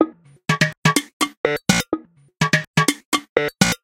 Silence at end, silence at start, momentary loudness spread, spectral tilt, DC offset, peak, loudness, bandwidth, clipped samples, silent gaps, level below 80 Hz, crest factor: 0.1 s; 0 s; 7 LU; -4 dB/octave; under 0.1%; 0 dBFS; -20 LUFS; 17 kHz; under 0.1%; 0.77-0.82 s, 1.13-1.20 s, 1.37-1.44 s, 2.67-2.74 s, 3.05-3.12 s, 3.29-3.36 s; -50 dBFS; 20 dB